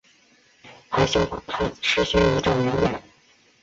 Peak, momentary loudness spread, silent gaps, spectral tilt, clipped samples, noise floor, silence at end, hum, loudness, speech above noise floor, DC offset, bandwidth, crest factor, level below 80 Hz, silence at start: -6 dBFS; 8 LU; none; -5 dB/octave; under 0.1%; -58 dBFS; 0.6 s; none; -22 LUFS; 36 dB; under 0.1%; 8 kHz; 18 dB; -40 dBFS; 0.65 s